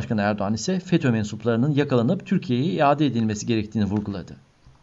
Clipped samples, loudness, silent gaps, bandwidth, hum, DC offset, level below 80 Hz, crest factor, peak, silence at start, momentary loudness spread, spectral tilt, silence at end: under 0.1%; -23 LUFS; none; 8 kHz; none; under 0.1%; -56 dBFS; 16 dB; -6 dBFS; 0 s; 5 LU; -6.5 dB/octave; 0.5 s